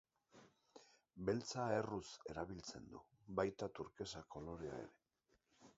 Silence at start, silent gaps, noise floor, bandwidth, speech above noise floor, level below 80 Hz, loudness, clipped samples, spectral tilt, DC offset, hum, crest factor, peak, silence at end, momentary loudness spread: 0.35 s; none; -82 dBFS; 7.6 kHz; 37 dB; -70 dBFS; -46 LUFS; under 0.1%; -5 dB/octave; under 0.1%; none; 24 dB; -24 dBFS; 0.05 s; 22 LU